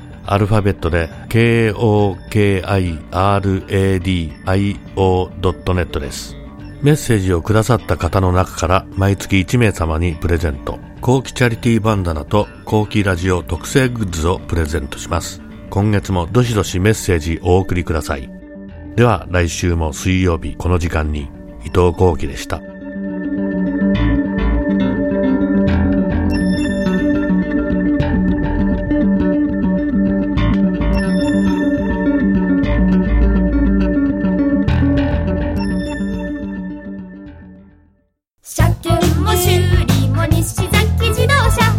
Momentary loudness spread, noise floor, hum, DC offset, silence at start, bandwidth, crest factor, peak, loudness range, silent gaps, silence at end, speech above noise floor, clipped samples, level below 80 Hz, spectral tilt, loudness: 9 LU; -62 dBFS; none; under 0.1%; 0 s; 16.5 kHz; 16 dB; 0 dBFS; 3 LU; none; 0 s; 46 dB; under 0.1%; -26 dBFS; -6.5 dB/octave; -16 LUFS